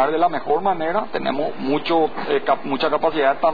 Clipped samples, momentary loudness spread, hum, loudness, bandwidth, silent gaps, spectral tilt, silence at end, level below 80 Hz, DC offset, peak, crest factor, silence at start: under 0.1%; 5 LU; none; -21 LUFS; 5 kHz; none; -7.5 dB/octave; 0 s; -52 dBFS; 3%; -4 dBFS; 16 dB; 0 s